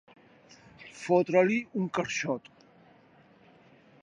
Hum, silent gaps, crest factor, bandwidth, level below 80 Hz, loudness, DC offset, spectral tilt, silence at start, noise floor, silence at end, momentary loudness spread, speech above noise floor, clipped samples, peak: none; none; 22 dB; 10 kHz; -74 dBFS; -28 LUFS; under 0.1%; -5.5 dB/octave; 0.8 s; -59 dBFS; 1.65 s; 19 LU; 32 dB; under 0.1%; -10 dBFS